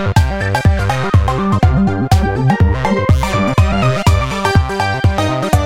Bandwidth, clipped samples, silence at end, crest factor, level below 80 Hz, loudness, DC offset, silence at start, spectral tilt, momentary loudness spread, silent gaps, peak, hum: 15.5 kHz; under 0.1%; 0 s; 12 dB; -20 dBFS; -14 LUFS; 1%; 0 s; -6.5 dB/octave; 2 LU; none; 0 dBFS; none